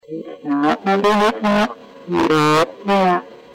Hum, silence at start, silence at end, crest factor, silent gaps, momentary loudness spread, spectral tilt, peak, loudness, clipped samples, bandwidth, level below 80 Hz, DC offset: none; 0.1 s; 0.2 s; 12 dB; none; 9 LU; -5.5 dB/octave; -6 dBFS; -17 LUFS; under 0.1%; 16.5 kHz; -52 dBFS; under 0.1%